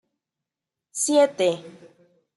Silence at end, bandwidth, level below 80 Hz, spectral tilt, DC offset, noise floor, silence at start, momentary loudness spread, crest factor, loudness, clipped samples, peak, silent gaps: 0.65 s; 12 kHz; -80 dBFS; -3 dB/octave; under 0.1%; -88 dBFS; 0.95 s; 15 LU; 18 dB; -21 LUFS; under 0.1%; -8 dBFS; none